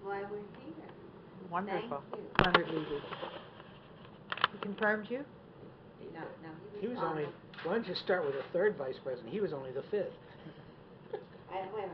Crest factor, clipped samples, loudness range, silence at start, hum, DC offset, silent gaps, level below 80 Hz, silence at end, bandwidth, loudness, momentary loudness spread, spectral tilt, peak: 30 dB; under 0.1%; 4 LU; 0 s; none; under 0.1%; none; -60 dBFS; 0 s; 6 kHz; -36 LUFS; 20 LU; -3 dB/octave; -8 dBFS